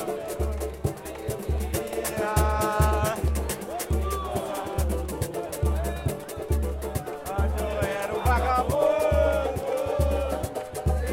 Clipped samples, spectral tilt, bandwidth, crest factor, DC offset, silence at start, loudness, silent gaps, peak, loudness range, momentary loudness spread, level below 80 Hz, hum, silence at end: under 0.1%; -5.5 dB/octave; 16.5 kHz; 16 dB; under 0.1%; 0 s; -27 LUFS; none; -10 dBFS; 4 LU; 9 LU; -30 dBFS; none; 0 s